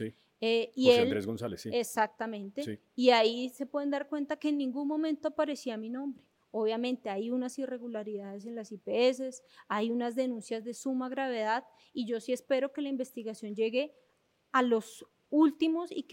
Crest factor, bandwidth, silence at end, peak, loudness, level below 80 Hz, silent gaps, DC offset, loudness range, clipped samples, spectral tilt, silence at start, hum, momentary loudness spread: 22 dB; 16.5 kHz; 0 s; -10 dBFS; -32 LUFS; -82 dBFS; none; under 0.1%; 5 LU; under 0.1%; -4.5 dB/octave; 0 s; none; 14 LU